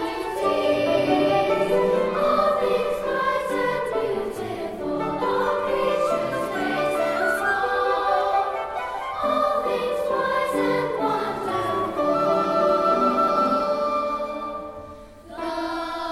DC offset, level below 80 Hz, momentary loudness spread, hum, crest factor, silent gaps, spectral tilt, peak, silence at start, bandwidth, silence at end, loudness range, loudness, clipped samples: under 0.1%; -52 dBFS; 9 LU; none; 14 dB; none; -5 dB/octave; -8 dBFS; 0 s; 15 kHz; 0 s; 3 LU; -23 LUFS; under 0.1%